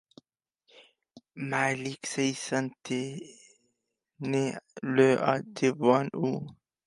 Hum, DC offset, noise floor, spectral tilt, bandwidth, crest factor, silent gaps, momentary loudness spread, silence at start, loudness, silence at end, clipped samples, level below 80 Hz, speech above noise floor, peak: none; under 0.1%; -81 dBFS; -5 dB/octave; 11.5 kHz; 22 dB; none; 15 LU; 0.8 s; -29 LUFS; 0.35 s; under 0.1%; -74 dBFS; 53 dB; -8 dBFS